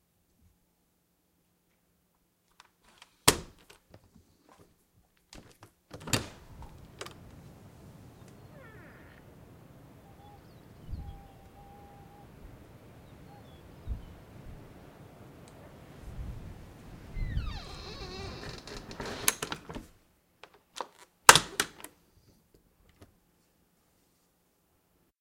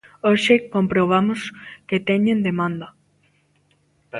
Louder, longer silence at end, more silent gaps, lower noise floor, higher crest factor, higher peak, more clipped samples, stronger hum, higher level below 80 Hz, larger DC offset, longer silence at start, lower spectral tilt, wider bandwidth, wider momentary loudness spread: second, -29 LUFS vs -19 LUFS; first, 2.15 s vs 0 s; neither; first, -73 dBFS vs -62 dBFS; first, 38 dB vs 18 dB; about the same, 0 dBFS vs -2 dBFS; neither; neither; first, -50 dBFS vs -58 dBFS; neither; first, 3.25 s vs 0.25 s; second, -1.5 dB/octave vs -6.5 dB/octave; first, 16.5 kHz vs 11.5 kHz; first, 27 LU vs 16 LU